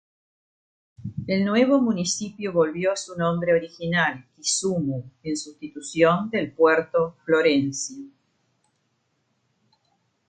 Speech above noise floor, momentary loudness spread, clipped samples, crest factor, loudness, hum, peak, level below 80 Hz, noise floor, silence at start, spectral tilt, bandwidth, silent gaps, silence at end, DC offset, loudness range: 49 dB; 13 LU; under 0.1%; 20 dB; -23 LUFS; none; -6 dBFS; -60 dBFS; -72 dBFS; 1 s; -4.5 dB/octave; 9.6 kHz; none; 2.2 s; under 0.1%; 3 LU